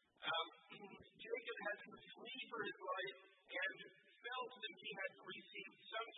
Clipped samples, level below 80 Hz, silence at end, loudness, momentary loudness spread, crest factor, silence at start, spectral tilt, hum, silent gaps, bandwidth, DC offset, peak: under 0.1%; under -90 dBFS; 0 s; -48 LUFS; 14 LU; 20 dB; 0.2 s; 2.5 dB/octave; none; none; 3.9 kHz; under 0.1%; -30 dBFS